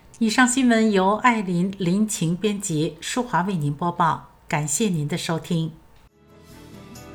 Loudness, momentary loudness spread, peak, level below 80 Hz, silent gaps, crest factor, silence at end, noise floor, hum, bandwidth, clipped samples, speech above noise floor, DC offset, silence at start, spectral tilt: -22 LUFS; 9 LU; -2 dBFS; -56 dBFS; none; 20 dB; 0 s; -52 dBFS; none; over 20 kHz; under 0.1%; 31 dB; under 0.1%; 0.15 s; -4.5 dB/octave